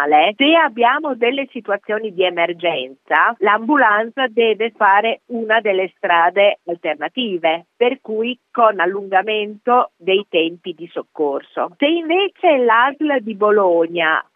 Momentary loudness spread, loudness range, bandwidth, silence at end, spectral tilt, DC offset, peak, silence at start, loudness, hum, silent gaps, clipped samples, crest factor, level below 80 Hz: 10 LU; 3 LU; 4 kHz; 0.15 s; -7 dB/octave; under 0.1%; 0 dBFS; 0 s; -16 LUFS; none; none; under 0.1%; 16 dB; -82 dBFS